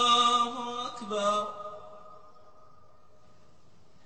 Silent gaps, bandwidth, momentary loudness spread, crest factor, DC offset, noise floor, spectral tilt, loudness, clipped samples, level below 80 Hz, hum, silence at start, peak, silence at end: none; 8.4 kHz; 25 LU; 18 dB; 0.3%; -62 dBFS; -2 dB/octave; -28 LUFS; under 0.1%; -72 dBFS; none; 0 s; -14 dBFS; 1.9 s